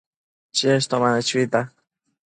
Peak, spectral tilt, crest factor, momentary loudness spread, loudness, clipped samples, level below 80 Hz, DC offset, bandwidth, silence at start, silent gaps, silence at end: -4 dBFS; -4 dB/octave; 18 dB; 6 LU; -21 LUFS; under 0.1%; -68 dBFS; under 0.1%; 10.5 kHz; 0.55 s; none; 0.55 s